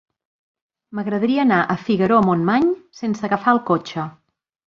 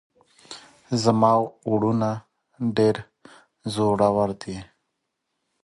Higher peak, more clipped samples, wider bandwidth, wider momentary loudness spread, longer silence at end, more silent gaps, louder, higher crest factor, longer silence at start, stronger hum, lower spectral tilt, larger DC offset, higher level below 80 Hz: about the same, -2 dBFS vs -4 dBFS; neither; second, 7.2 kHz vs 11.5 kHz; second, 13 LU vs 19 LU; second, 0.55 s vs 1 s; neither; first, -19 LUFS vs -23 LUFS; about the same, 18 dB vs 20 dB; first, 0.9 s vs 0.5 s; neither; about the same, -7.5 dB/octave vs -6.5 dB/octave; neither; about the same, -58 dBFS vs -58 dBFS